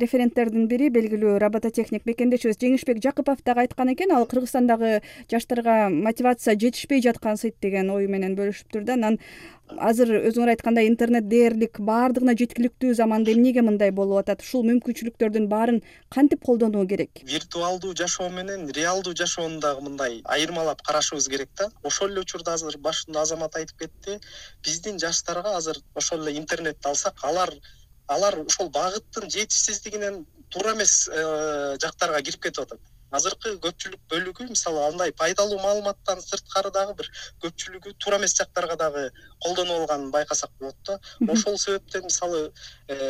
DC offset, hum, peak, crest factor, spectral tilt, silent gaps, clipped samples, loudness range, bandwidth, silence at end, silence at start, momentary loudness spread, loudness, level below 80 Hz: under 0.1%; none; -6 dBFS; 18 dB; -3 dB/octave; none; under 0.1%; 6 LU; 15.5 kHz; 0 s; 0 s; 10 LU; -24 LUFS; -56 dBFS